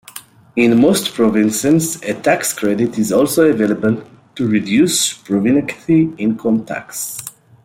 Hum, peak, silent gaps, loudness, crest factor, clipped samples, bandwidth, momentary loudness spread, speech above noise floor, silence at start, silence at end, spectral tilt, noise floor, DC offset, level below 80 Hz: none; -2 dBFS; none; -15 LUFS; 14 dB; under 0.1%; 16.5 kHz; 11 LU; 23 dB; 0.15 s; 0.35 s; -4.5 dB/octave; -38 dBFS; under 0.1%; -54 dBFS